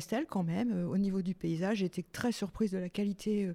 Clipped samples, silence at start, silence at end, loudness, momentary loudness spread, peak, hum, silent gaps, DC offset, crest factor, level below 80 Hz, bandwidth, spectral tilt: under 0.1%; 0 s; 0 s; -34 LUFS; 3 LU; -20 dBFS; none; none; under 0.1%; 14 dB; -60 dBFS; 15 kHz; -6.5 dB/octave